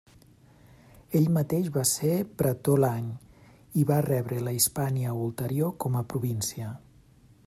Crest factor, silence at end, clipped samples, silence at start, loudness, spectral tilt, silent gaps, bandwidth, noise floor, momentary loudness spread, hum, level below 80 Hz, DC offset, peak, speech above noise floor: 18 dB; 0.7 s; under 0.1%; 1.1 s; -27 LUFS; -5.5 dB/octave; none; 16 kHz; -57 dBFS; 9 LU; none; -60 dBFS; under 0.1%; -10 dBFS; 30 dB